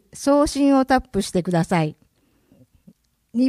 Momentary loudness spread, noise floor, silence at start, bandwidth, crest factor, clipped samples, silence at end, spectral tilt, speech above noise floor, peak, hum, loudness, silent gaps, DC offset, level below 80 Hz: 7 LU; -61 dBFS; 0.15 s; 14 kHz; 16 dB; under 0.1%; 0 s; -6 dB/octave; 42 dB; -4 dBFS; none; -20 LUFS; none; under 0.1%; -44 dBFS